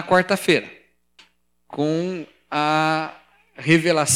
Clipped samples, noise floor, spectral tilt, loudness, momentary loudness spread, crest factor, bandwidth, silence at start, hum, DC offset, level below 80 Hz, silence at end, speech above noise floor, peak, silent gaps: under 0.1%; -59 dBFS; -4 dB/octave; -20 LUFS; 16 LU; 20 dB; 16 kHz; 0 s; 60 Hz at -55 dBFS; under 0.1%; -64 dBFS; 0 s; 39 dB; -2 dBFS; none